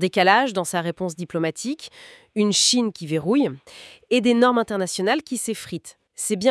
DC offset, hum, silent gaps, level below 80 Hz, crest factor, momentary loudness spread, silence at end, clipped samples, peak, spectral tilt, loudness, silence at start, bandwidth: under 0.1%; none; none; -68 dBFS; 20 dB; 17 LU; 0 s; under 0.1%; -2 dBFS; -3.5 dB/octave; -21 LUFS; 0 s; 12 kHz